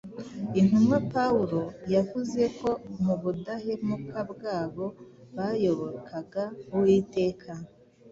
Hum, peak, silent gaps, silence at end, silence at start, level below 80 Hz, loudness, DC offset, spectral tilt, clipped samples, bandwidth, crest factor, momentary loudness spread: none; -12 dBFS; none; 0 s; 0.05 s; -60 dBFS; -28 LUFS; under 0.1%; -8 dB/octave; under 0.1%; 7.8 kHz; 16 dB; 14 LU